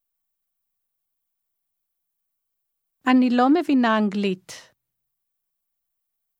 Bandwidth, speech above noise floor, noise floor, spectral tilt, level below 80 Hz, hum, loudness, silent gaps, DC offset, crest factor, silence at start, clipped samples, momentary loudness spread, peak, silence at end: 11 kHz; 60 dB; -80 dBFS; -6 dB/octave; -78 dBFS; none; -20 LUFS; none; under 0.1%; 22 dB; 3.05 s; under 0.1%; 10 LU; -4 dBFS; 1.8 s